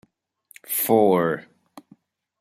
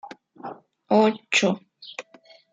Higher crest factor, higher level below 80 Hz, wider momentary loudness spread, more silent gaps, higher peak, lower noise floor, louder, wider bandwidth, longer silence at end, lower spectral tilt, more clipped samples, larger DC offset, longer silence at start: about the same, 20 dB vs 18 dB; first, -70 dBFS vs -76 dBFS; second, 10 LU vs 20 LU; neither; about the same, -4 dBFS vs -6 dBFS; first, -59 dBFS vs -54 dBFS; about the same, -21 LUFS vs -22 LUFS; first, 16 kHz vs 9.4 kHz; first, 1 s vs 0.5 s; about the same, -5 dB/octave vs -4 dB/octave; neither; neither; first, 0.7 s vs 0.05 s